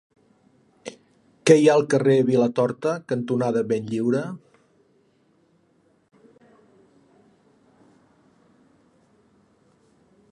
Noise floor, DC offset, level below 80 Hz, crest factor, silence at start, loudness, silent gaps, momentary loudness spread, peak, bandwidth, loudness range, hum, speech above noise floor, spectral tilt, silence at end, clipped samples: -63 dBFS; under 0.1%; -72 dBFS; 22 dB; 0.85 s; -21 LUFS; none; 25 LU; -2 dBFS; 11.5 kHz; 12 LU; none; 43 dB; -6 dB/octave; 5.95 s; under 0.1%